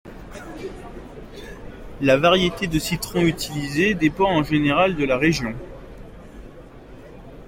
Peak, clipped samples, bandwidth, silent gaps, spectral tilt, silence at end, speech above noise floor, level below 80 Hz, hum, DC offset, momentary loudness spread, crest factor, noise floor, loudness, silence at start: -4 dBFS; under 0.1%; 16.5 kHz; none; -5 dB/octave; 0 s; 22 dB; -42 dBFS; none; under 0.1%; 25 LU; 20 dB; -42 dBFS; -20 LUFS; 0.05 s